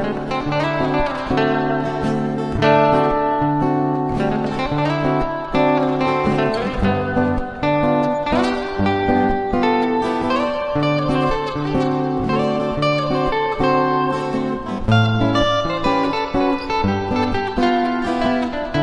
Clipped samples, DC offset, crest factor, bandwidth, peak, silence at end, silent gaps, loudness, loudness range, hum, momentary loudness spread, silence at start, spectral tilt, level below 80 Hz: under 0.1%; under 0.1%; 16 dB; 10.5 kHz; -2 dBFS; 0 s; none; -19 LUFS; 1 LU; none; 4 LU; 0 s; -7 dB/octave; -36 dBFS